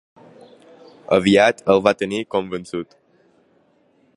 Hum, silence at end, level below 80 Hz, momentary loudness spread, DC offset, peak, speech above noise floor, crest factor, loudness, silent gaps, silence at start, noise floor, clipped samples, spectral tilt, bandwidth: none; 1.35 s; -56 dBFS; 16 LU; under 0.1%; 0 dBFS; 41 dB; 20 dB; -18 LUFS; none; 1.1 s; -59 dBFS; under 0.1%; -5.5 dB/octave; 11.5 kHz